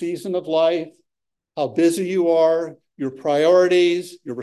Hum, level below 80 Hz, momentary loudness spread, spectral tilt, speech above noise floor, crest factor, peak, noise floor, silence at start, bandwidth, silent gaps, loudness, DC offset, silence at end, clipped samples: none; -76 dBFS; 15 LU; -5 dB/octave; 65 dB; 14 dB; -6 dBFS; -84 dBFS; 0 s; 12.5 kHz; none; -19 LUFS; under 0.1%; 0 s; under 0.1%